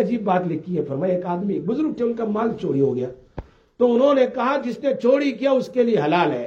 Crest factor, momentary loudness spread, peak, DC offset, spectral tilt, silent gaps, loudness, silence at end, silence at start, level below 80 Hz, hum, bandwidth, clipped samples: 14 dB; 8 LU; -6 dBFS; under 0.1%; -7.5 dB/octave; none; -21 LUFS; 0 s; 0 s; -54 dBFS; none; 7.6 kHz; under 0.1%